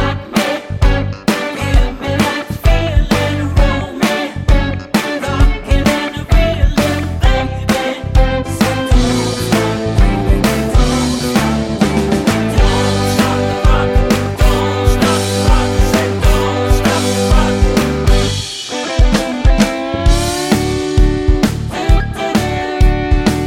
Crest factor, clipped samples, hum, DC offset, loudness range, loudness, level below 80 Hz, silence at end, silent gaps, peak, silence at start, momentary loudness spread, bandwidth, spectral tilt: 12 dB; under 0.1%; none; under 0.1%; 2 LU; -14 LUFS; -16 dBFS; 0 s; none; 0 dBFS; 0 s; 4 LU; 16.5 kHz; -5.5 dB/octave